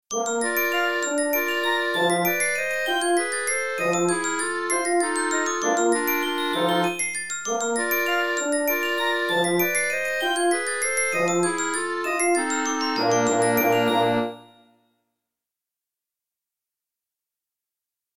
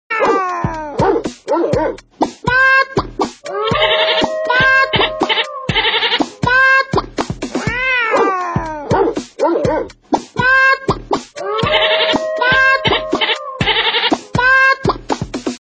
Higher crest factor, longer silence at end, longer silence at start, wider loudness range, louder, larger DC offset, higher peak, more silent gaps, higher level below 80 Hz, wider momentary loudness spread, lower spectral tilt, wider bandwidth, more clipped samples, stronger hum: about the same, 16 dB vs 14 dB; first, 3.65 s vs 0.05 s; about the same, 0.1 s vs 0.1 s; about the same, 2 LU vs 3 LU; second, -22 LUFS vs -14 LUFS; first, 0.4% vs under 0.1%; second, -10 dBFS vs -2 dBFS; neither; second, -68 dBFS vs -38 dBFS; second, 4 LU vs 11 LU; second, -2.5 dB/octave vs -4.5 dB/octave; first, 17 kHz vs 9.6 kHz; neither; neither